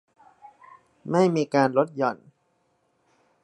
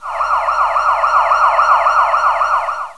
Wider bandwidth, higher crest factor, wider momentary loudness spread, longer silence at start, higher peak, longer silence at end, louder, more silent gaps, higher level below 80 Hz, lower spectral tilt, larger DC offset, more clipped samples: about the same, 11 kHz vs 11 kHz; first, 22 dB vs 14 dB; first, 15 LU vs 5 LU; first, 1.05 s vs 0 s; second, -6 dBFS vs 0 dBFS; first, 1.3 s vs 0.05 s; second, -23 LUFS vs -13 LUFS; neither; second, -74 dBFS vs -46 dBFS; first, -7 dB/octave vs -1 dB/octave; second, under 0.1% vs 0.5%; neither